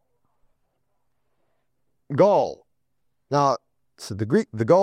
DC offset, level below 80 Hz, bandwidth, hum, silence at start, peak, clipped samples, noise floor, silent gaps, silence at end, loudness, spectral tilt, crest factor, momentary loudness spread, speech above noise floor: under 0.1%; -68 dBFS; 12.5 kHz; none; 2.1 s; -4 dBFS; under 0.1%; -78 dBFS; none; 0 s; -22 LUFS; -7 dB/octave; 20 dB; 13 LU; 58 dB